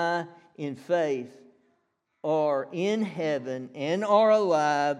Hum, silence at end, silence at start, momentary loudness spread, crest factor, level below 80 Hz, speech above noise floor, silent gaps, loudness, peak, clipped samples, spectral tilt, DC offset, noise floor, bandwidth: none; 0 s; 0 s; 15 LU; 16 dB; -88 dBFS; 49 dB; none; -26 LUFS; -10 dBFS; under 0.1%; -5.5 dB/octave; under 0.1%; -75 dBFS; 10.5 kHz